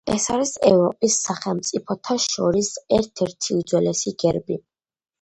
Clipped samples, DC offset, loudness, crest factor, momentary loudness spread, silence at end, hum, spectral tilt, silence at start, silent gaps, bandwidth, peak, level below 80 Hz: under 0.1%; under 0.1%; -21 LUFS; 20 dB; 8 LU; 0.6 s; none; -4 dB/octave; 0.05 s; none; 11 kHz; -2 dBFS; -52 dBFS